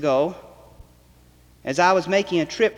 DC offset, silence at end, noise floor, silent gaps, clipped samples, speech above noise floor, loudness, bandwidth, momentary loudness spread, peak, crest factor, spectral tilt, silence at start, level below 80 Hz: under 0.1%; 0.05 s; -53 dBFS; none; under 0.1%; 33 dB; -21 LUFS; 13 kHz; 14 LU; -4 dBFS; 18 dB; -4.5 dB/octave; 0 s; -54 dBFS